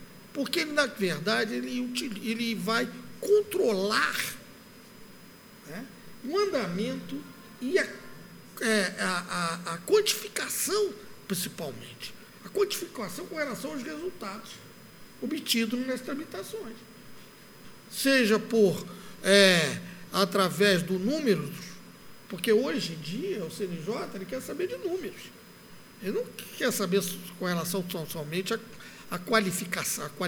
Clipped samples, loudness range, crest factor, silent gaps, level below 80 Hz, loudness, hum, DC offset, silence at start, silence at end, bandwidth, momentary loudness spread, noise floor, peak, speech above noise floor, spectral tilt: under 0.1%; 9 LU; 26 dB; none; -66 dBFS; -29 LUFS; none; under 0.1%; 0 s; 0 s; over 20 kHz; 18 LU; -51 dBFS; -4 dBFS; 22 dB; -3.5 dB/octave